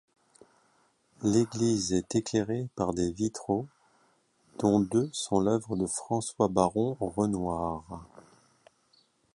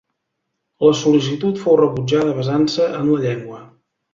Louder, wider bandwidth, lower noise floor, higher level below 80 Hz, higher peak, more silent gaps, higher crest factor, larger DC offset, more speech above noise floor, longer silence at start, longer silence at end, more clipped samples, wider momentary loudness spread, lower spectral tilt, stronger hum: second, -29 LUFS vs -17 LUFS; first, 11.5 kHz vs 7.6 kHz; second, -68 dBFS vs -75 dBFS; about the same, -56 dBFS vs -56 dBFS; second, -10 dBFS vs -2 dBFS; neither; first, 22 dB vs 16 dB; neither; second, 40 dB vs 59 dB; first, 1.2 s vs 0.8 s; first, 1.15 s vs 0.5 s; neither; about the same, 7 LU vs 6 LU; about the same, -6 dB/octave vs -6.5 dB/octave; neither